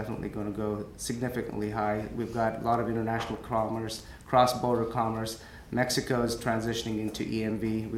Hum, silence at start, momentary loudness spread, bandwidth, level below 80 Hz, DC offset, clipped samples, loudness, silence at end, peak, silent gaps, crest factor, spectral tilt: none; 0 s; 8 LU; 16.5 kHz; -50 dBFS; under 0.1%; under 0.1%; -30 LUFS; 0 s; -10 dBFS; none; 20 dB; -5 dB/octave